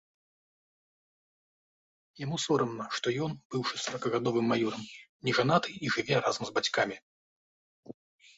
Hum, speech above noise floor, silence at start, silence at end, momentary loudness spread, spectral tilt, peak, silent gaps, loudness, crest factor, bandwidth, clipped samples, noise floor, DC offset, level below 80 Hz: none; over 59 dB; 2.15 s; 0.45 s; 8 LU; -4.5 dB/octave; -12 dBFS; 3.45-3.50 s, 5.09-5.20 s, 7.02-7.83 s; -30 LUFS; 20 dB; 8 kHz; under 0.1%; under -90 dBFS; under 0.1%; -70 dBFS